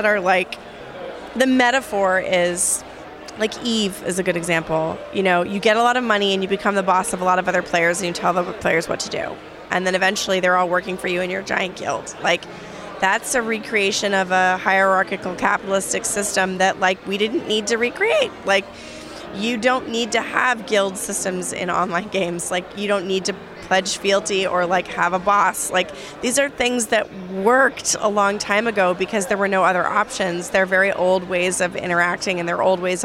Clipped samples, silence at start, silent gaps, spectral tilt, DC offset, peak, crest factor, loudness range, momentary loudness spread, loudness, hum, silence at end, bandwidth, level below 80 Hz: under 0.1%; 0 s; none; -3 dB/octave; under 0.1%; 0 dBFS; 20 dB; 3 LU; 8 LU; -19 LUFS; none; 0 s; 16 kHz; -54 dBFS